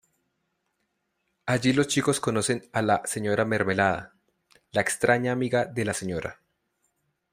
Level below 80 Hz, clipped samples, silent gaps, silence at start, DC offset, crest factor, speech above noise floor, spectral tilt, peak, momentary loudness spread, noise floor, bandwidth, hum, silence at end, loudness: -60 dBFS; under 0.1%; none; 1.45 s; under 0.1%; 20 dB; 52 dB; -4.5 dB/octave; -6 dBFS; 8 LU; -77 dBFS; 16 kHz; none; 1 s; -25 LUFS